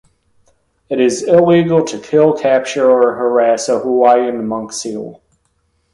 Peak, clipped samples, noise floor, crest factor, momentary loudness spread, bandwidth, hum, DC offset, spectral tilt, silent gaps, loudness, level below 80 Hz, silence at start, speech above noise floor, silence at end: 0 dBFS; under 0.1%; -62 dBFS; 14 dB; 12 LU; 11.5 kHz; none; under 0.1%; -5.5 dB/octave; none; -13 LUFS; -56 dBFS; 0.9 s; 50 dB; 0.8 s